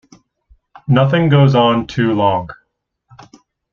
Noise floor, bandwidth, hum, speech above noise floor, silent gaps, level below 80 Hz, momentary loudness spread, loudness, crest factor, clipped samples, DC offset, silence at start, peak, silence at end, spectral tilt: -68 dBFS; 6.8 kHz; none; 56 dB; none; -48 dBFS; 12 LU; -14 LUFS; 14 dB; under 0.1%; under 0.1%; 0.9 s; -2 dBFS; 1.2 s; -8 dB/octave